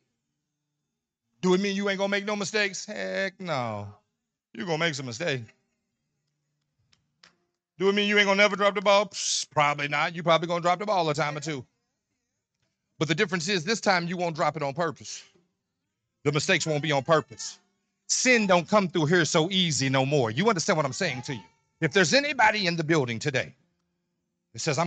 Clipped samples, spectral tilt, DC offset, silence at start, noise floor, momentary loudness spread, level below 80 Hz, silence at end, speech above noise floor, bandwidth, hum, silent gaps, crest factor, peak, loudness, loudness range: under 0.1%; -4 dB/octave; under 0.1%; 1.45 s; -84 dBFS; 13 LU; -70 dBFS; 0 s; 58 dB; 9.4 kHz; none; none; 18 dB; -8 dBFS; -25 LUFS; 8 LU